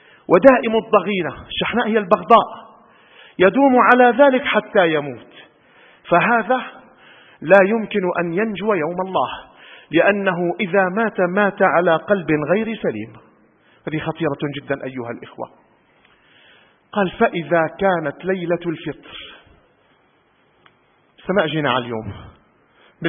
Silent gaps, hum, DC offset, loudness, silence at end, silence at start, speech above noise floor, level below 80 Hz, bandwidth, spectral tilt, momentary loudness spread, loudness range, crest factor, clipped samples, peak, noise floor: none; none; under 0.1%; -17 LUFS; 0 s; 0.3 s; 41 dB; -56 dBFS; 4.2 kHz; -8.5 dB/octave; 19 LU; 11 LU; 20 dB; under 0.1%; 0 dBFS; -59 dBFS